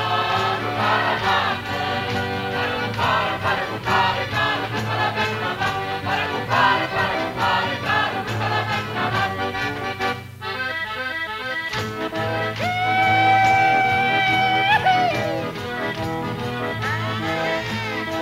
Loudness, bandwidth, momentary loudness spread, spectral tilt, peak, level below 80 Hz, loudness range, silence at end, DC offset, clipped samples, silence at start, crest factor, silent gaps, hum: -21 LUFS; 16 kHz; 9 LU; -4.5 dB/octave; -4 dBFS; -50 dBFS; 7 LU; 0 s; under 0.1%; under 0.1%; 0 s; 16 dB; none; none